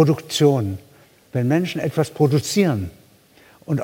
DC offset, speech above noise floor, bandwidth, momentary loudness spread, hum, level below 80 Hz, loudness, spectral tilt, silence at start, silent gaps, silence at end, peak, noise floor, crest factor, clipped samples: under 0.1%; 33 dB; 17 kHz; 11 LU; none; -60 dBFS; -20 LUFS; -6 dB/octave; 0 s; none; 0 s; -2 dBFS; -52 dBFS; 18 dB; under 0.1%